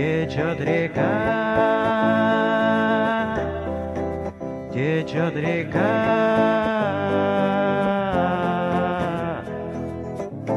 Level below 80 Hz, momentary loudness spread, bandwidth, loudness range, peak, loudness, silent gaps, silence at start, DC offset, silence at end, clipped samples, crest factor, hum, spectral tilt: -44 dBFS; 11 LU; 11 kHz; 3 LU; -6 dBFS; -22 LUFS; none; 0 s; under 0.1%; 0 s; under 0.1%; 14 dB; none; -7.5 dB/octave